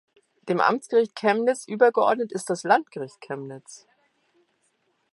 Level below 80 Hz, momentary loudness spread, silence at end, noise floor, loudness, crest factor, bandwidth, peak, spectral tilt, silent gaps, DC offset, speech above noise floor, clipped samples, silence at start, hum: -80 dBFS; 16 LU; 1.4 s; -70 dBFS; -23 LUFS; 20 dB; 11.5 kHz; -4 dBFS; -4.5 dB/octave; none; under 0.1%; 47 dB; under 0.1%; 0.45 s; none